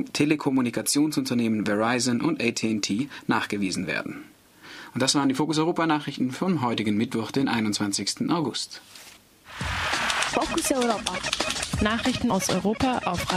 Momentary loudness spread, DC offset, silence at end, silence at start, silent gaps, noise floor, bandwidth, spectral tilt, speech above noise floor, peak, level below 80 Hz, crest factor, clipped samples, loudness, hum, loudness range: 7 LU; under 0.1%; 0 s; 0 s; none; -49 dBFS; 15.5 kHz; -4 dB/octave; 24 dB; -6 dBFS; -48 dBFS; 20 dB; under 0.1%; -25 LUFS; none; 2 LU